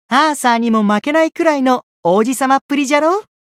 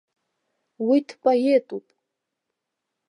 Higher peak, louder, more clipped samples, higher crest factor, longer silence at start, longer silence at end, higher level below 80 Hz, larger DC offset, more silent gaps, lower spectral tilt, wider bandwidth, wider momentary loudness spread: first, 0 dBFS vs -8 dBFS; first, -14 LUFS vs -22 LUFS; neither; about the same, 14 dB vs 18 dB; second, 0.1 s vs 0.8 s; second, 0.2 s vs 1.3 s; first, -66 dBFS vs -84 dBFS; neither; first, 1.83-2.03 s, 2.61-2.69 s vs none; second, -4.5 dB/octave vs -6 dB/octave; first, 15.5 kHz vs 11 kHz; second, 3 LU vs 16 LU